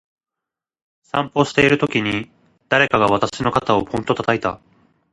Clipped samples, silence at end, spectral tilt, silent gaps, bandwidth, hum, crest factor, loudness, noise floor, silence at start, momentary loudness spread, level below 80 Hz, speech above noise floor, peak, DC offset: under 0.1%; 0.55 s; -5.5 dB/octave; none; 11.5 kHz; none; 20 dB; -18 LUFS; -86 dBFS; 1.15 s; 10 LU; -50 dBFS; 68 dB; 0 dBFS; under 0.1%